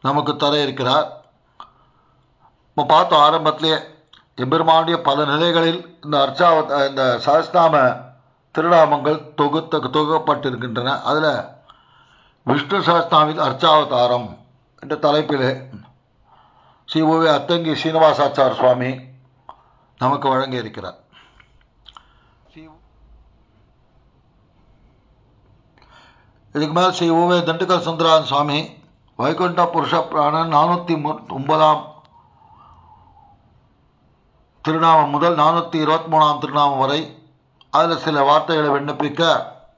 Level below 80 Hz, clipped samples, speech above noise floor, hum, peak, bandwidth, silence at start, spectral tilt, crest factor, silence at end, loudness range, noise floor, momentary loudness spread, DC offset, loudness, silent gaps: -62 dBFS; under 0.1%; 41 dB; none; -2 dBFS; 7.6 kHz; 0.05 s; -6 dB/octave; 18 dB; 0.25 s; 7 LU; -58 dBFS; 10 LU; under 0.1%; -17 LUFS; none